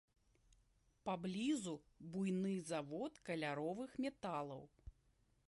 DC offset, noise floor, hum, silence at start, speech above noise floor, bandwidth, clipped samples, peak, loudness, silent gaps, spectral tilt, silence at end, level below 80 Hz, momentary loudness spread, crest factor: under 0.1%; -77 dBFS; none; 1.05 s; 33 dB; 11.5 kHz; under 0.1%; -30 dBFS; -44 LUFS; none; -5.5 dB/octave; 0.55 s; -72 dBFS; 12 LU; 16 dB